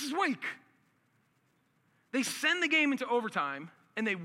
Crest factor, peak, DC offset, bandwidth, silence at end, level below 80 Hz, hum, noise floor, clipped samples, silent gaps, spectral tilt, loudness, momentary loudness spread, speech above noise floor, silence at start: 20 dB; -14 dBFS; under 0.1%; 16.5 kHz; 0 s; under -90 dBFS; none; -73 dBFS; under 0.1%; none; -3 dB/octave; -31 LUFS; 15 LU; 41 dB; 0 s